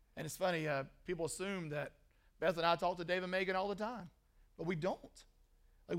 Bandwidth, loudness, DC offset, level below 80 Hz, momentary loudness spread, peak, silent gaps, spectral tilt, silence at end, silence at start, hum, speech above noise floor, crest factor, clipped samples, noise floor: 16 kHz; -39 LUFS; under 0.1%; -66 dBFS; 11 LU; -18 dBFS; none; -4.5 dB/octave; 0 s; 0.15 s; none; 29 dB; 22 dB; under 0.1%; -68 dBFS